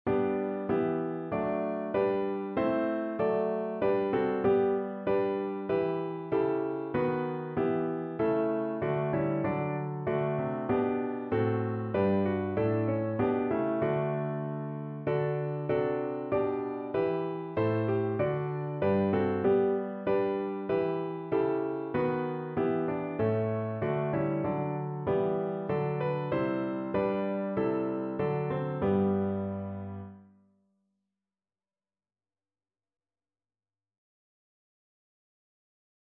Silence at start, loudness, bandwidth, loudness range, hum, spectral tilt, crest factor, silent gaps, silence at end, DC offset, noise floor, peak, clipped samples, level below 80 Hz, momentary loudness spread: 0.05 s; -30 LUFS; 4.5 kHz; 3 LU; none; -11.5 dB/octave; 16 dB; none; 5.9 s; under 0.1%; under -90 dBFS; -14 dBFS; under 0.1%; -62 dBFS; 5 LU